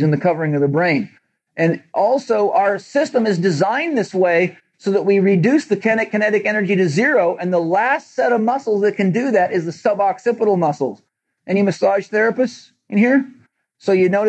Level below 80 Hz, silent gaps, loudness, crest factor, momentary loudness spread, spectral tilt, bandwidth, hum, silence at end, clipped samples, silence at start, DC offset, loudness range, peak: -82 dBFS; none; -17 LUFS; 14 dB; 6 LU; -7 dB/octave; 8.6 kHz; none; 0 s; under 0.1%; 0 s; under 0.1%; 2 LU; -4 dBFS